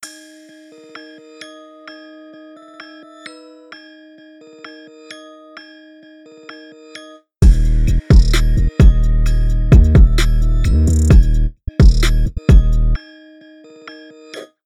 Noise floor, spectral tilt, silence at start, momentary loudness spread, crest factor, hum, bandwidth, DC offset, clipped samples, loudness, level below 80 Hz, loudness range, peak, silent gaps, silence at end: -42 dBFS; -6.5 dB/octave; 0.05 s; 26 LU; 14 dB; none; 11.5 kHz; under 0.1%; under 0.1%; -14 LUFS; -16 dBFS; 23 LU; 0 dBFS; none; 0.2 s